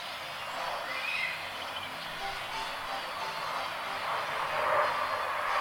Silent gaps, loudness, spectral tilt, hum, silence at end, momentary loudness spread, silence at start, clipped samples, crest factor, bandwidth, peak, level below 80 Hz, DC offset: none; -33 LUFS; -2 dB/octave; none; 0 s; 8 LU; 0 s; under 0.1%; 18 dB; 19 kHz; -16 dBFS; -62 dBFS; under 0.1%